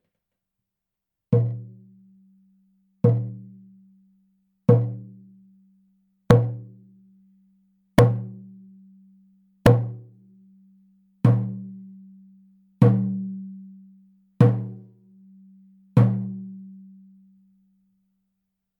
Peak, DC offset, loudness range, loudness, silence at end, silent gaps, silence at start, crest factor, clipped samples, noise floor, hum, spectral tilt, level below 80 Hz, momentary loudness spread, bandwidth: 0 dBFS; under 0.1%; 4 LU; -22 LUFS; 2.05 s; none; 1.3 s; 26 dB; under 0.1%; -85 dBFS; none; -9 dB/octave; -50 dBFS; 24 LU; 10.5 kHz